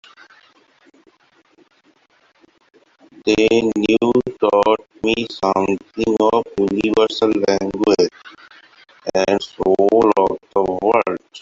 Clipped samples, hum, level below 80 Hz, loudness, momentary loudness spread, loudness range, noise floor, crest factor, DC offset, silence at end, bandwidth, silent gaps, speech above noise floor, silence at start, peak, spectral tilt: under 0.1%; none; -52 dBFS; -17 LUFS; 6 LU; 3 LU; -57 dBFS; 18 dB; under 0.1%; 0 s; 7.6 kHz; none; 41 dB; 3.25 s; -2 dBFS; -5 dB/octave